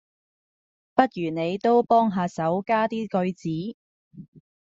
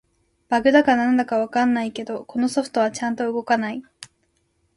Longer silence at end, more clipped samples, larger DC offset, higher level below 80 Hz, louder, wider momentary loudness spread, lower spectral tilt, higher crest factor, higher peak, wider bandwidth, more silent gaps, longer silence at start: second, 0.25 s vs 0.7 s; neither; neither; about the same, -66 dBFS vs -62 dBFS; second, -24 LUFS vs -21 LUFS; about the same, 10 LU vs 12 LU; about the same, -5.5 dB/octave vs -4.5 dB/octave; about the same, 22 dB vs 20 dB; about the same, -2 dBFS vs -2 dBFS; second, 7.8 kHz vs 11.5 kHz; first, 3.74-4.11 s, 4.28-4.33 s vs none; first, 0.95 s vs 0.5 s